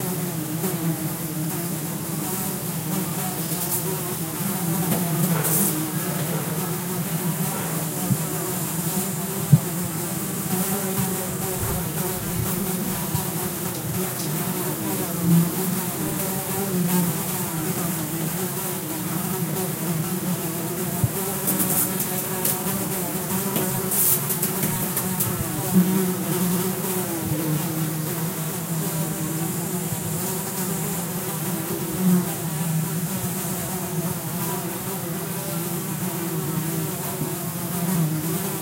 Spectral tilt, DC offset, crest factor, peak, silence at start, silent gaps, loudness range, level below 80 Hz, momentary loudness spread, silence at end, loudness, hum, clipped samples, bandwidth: -4.5 dB/octave; under 0.1%; 22 dB; -2 dBFS; 0 s; none; 4 LU; -52 dBFS; 6 LU; 0 s; -24 LUFS; none; under 0.1%; 16 kHz